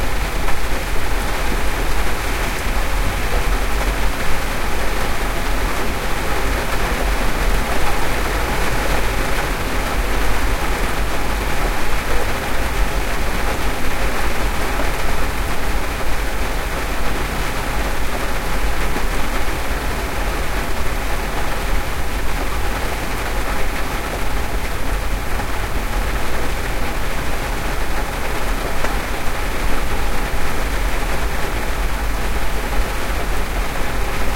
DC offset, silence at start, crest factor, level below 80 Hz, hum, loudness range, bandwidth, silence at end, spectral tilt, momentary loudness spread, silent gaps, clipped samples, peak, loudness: under 0.1%; 0 s; 14 dB; -22 dBFS; none; 3 LU; 16.5 kHz; 0 s; -4 dB/octave; 3 LU; none; under 0.1%; -2 dBFS; -22 LUFS